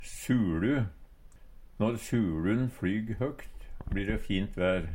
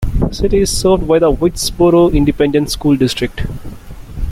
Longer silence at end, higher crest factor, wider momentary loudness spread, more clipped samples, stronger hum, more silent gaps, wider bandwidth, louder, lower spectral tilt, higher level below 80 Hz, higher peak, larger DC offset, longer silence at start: about the same, 0 s vs 0 s; about the same, 16 dB vs 12 dB; second, 9 LU vs 15 LU; neither; neither; neither; about the same, 17 kHz vs 16 kHz; second, -31 LUFS vs -13 LUFS; about the same, -6.5 dB/octave vs -5.5 dB/octave; second, -44 dBFS vs -24 dBFS; second, -14 dBFS vs -2 dBFS; neither; about the same, 0 s vs 0 s